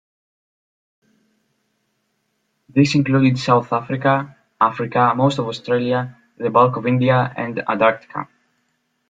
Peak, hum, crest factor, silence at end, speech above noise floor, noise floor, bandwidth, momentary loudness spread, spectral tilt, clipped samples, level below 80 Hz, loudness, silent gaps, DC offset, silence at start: -2 dBFS; none; 18 dB; 0.85 s; 52 dB; -70 dBFS; 7.8 kHz; 11 LU; -7 dB/octave; under 0.1%; -60 dBFS; -18 LUFS; none; under 0.1%; 2.75 s